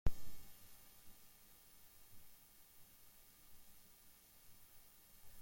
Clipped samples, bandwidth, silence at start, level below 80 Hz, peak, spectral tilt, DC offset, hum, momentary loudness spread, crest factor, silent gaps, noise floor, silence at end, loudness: under 0.1%; 16.5 kHz; 0.05 s; -56 dBFS; -20 dBFS; -4.5 dB/octave; under 0.1%; none; 3 LU; 24 dB; none; -65 dBFS; 0 s; -61 LUFS